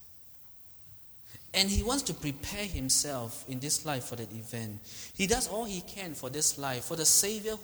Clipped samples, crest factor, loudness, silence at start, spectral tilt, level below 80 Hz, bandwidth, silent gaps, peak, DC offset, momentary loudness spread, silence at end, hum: under 0.1%; 24 dB; -30 LUFS; 0 s; -2.5 dB/octave; -48 dBFS; over 20 kHz; none; -10 dBFS; under 0.1%; 22 LU; 0 s; none